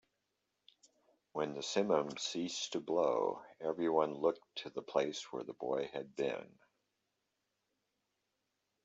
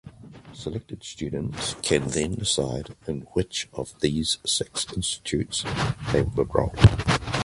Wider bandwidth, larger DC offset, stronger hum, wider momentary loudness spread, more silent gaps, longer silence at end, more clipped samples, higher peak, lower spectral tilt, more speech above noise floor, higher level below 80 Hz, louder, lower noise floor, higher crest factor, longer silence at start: second, 8.2 kHz vs 11.5 kHz; neither; neither; about the same, 11 LU vs 13 LU; neither; first, 2.4 s vs 0 s; neither; second, -16 dBFS vs -2 dBFS; about the same, -4 dB/octave vs -4.5 dB/octave; first, 49 dB vs 20 dB; second, -84 dBFS vs -38 dBFS; second, -37 LUFS vs -25 LUFS; first, -85 dBFS vs -45 dBFS; about the same, 22 dB vs 24 dB; first, 1.35 s vs 0.05 s